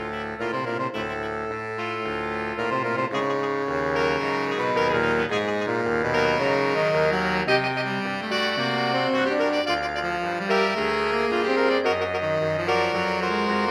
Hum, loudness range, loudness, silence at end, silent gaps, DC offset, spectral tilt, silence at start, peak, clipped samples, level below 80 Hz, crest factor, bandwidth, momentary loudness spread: none; 4 LU; -24 LUFS; 0 s; none; under 0.1%; -5 dB/octave; 0 s; -8 dBFS; under 0.1%; -52 dBFS; 16 dB; 13.5 kHz; 6 LU